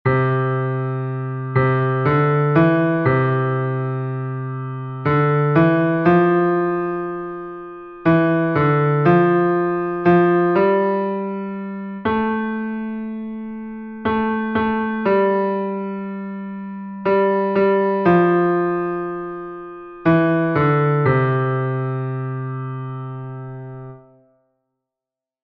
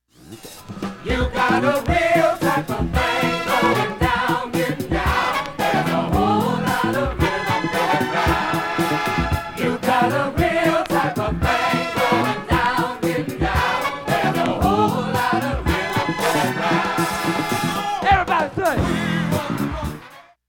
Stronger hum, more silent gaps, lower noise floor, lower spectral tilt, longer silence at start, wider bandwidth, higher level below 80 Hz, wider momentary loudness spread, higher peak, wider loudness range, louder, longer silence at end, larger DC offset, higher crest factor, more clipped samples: neither; neither; first, -88 dBFS vs -44 dBFS; first, -11 dB/octave vs -5 dB/octave; second, 0.05 s vs 0.25 s; second, 5 kHz vs 17.5 kHz; second, -52 dBFS vs -34 dBFS; first, 15 LU vs 5 LU; about the same, -4 dBFS vs -4 dBFS; first, 6 LU vs 1 LU; about the same, -19 LUFS vs -20 LUFS; first, 1.45 s vs 0.25 s; neither; about the same, 16 dB vs 16 dB; neither